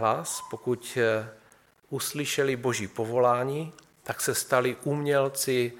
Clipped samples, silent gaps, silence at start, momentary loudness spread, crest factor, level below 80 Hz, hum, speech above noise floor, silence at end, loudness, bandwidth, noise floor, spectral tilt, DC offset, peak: under 0.1%; none; 0 s; 11 LU; 22 dB; -70 dBFS; none; 33 dB; 0 s; -28 LUFS; 17.5 kHz; -60 dBFS; -4 dB/octave; under 0.1%; -6 dBFS